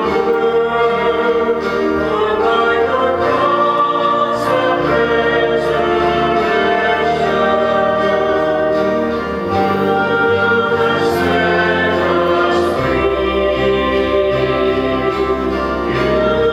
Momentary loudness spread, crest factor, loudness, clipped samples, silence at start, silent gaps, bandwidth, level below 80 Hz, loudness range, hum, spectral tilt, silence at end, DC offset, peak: 3 LU; 12 dB; -15 LUFS; under 0.1%; 0 s; none; 13.5 kHz; -36 dBFS; 1 LU; none; -6 dB/octave; 0 s; under 0.1%; -2 dBFS